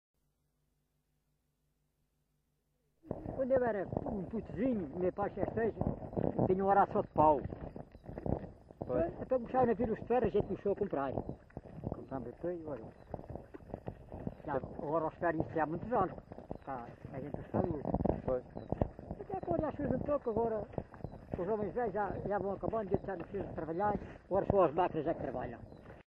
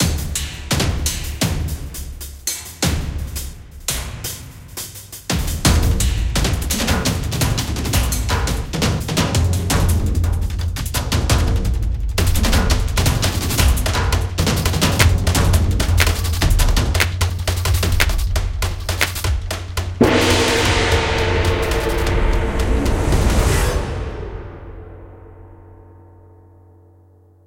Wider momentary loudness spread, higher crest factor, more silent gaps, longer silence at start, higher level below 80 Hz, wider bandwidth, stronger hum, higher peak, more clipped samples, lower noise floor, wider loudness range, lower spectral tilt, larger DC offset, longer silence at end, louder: first, 16 LU vs 12 LU; about the same, 22 dB vs 18 dB; neither; first, 3.05 s vs 0 s; second, -54 dBFS vs -22 dBFS; second, 5.4 kHz vs 17 kHz; neither; second, -14 dBFS vs 0 dBFS; neither; first, -80 dBFS vs -49 dBFS; about the same, 7 LU vs 7 LU; first, -10.5 dB/octave vs -4.5 dB/octave; neither; second, 0.15 s vs 1.7 s; second, -36 LUFS vs -19 LUFS